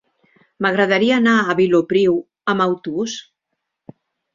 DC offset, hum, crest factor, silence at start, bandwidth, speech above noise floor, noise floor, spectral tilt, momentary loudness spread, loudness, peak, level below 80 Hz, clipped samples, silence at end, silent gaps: under 0.1%; none; 16 dB; 0.6 s; 7.6 kHz; 61 dB; -77 dBFS; -5.5 dB/octave; 9 LU; -17 LUFS; -2 dBFS; -62 dBFS; under 0.1%; 1.15 s; none